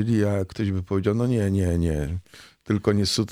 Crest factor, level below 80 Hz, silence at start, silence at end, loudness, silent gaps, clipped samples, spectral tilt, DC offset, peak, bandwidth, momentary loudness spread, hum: 16 dB; -40 dBFS; 0 s; 0 s; -24 LUFS; none; under 0.1%; -6.5 dB/octave; under 0.1%; -8 dBFS; 15.5 kHz; 6 LU; none